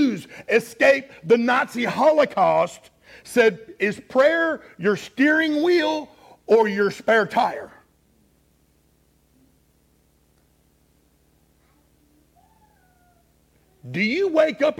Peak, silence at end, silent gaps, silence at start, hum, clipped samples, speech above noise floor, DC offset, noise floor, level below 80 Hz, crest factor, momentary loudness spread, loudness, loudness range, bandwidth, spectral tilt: -4 dBFS; 0.05 s; none; 0 s; none; under 0.1%; 42 dB; under 0.1%; -62 dBFS; -66 dBFS; 18 dB; 8 LU; -20 LUFS; 7 LU; 16 kHz; -5 dB/octave